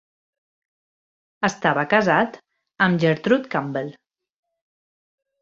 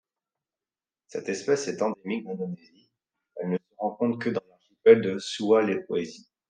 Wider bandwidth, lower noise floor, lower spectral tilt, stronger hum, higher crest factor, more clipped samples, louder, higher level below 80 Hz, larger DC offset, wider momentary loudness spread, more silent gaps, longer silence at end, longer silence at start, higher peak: second, 7.8 kHz vs 9.4 kHz; about the same, under -90 dBFS vs under -90 dBFS; about the same, -6 dB/octave vs -5.5 dB/octave; neither; about the same, 22 dB vs 24 dB; neither; first, -21 LUFS vs -26 LUFS; first, -64 dBFS vs -80 dBFS; neither; second, 10 LU vs 16 LU; neither; first, 1.5 s vs 0.35 s; first, 1.4 s vs 1.15 s; about the same, -2 dBFS vs -4 dBFS